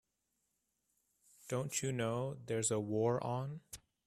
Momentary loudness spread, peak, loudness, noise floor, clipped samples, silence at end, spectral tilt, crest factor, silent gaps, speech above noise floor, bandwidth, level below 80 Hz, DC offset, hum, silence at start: 13 LU; -22 dBFS; -38 LUFS; -84 dBFS; under 0.1%; 0.3 s; -5 dB/octave; 18 dB; none; 47 dB; 14.5 kHz; -72 dBFS; under 0.1%; none; 1.45 s